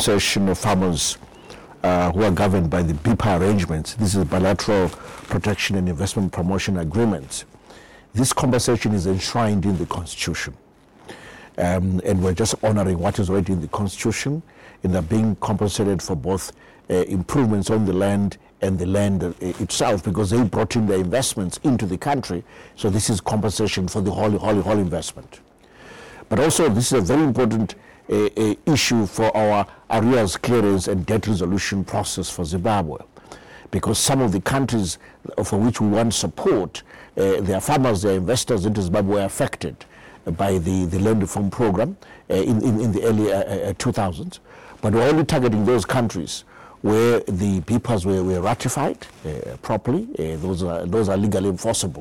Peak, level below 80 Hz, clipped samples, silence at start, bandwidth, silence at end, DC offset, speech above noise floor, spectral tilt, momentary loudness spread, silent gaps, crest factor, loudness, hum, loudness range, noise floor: -10 dBFS; -42 dBFS; under 0.1%; 0 s; 16.5 kHz; 0 s; 0.4%; 25 dB; -5.5 dB/octave; 10 LU; none; 10 dB; -21 LUFS; none; 3 LU; -46 dBFS